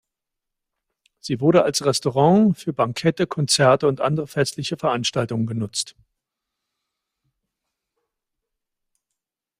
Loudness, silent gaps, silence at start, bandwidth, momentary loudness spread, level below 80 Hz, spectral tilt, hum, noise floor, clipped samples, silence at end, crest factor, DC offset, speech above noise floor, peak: -20 LUFS; none; 1.25 s; 15.5 kHz; 9 LU; -62 dBFS; -5 dB/octave; none; -84 dBFS; under 0.1%; 3.7 s; 20 dB; under 0.1%; 64 dB; -2 dBFS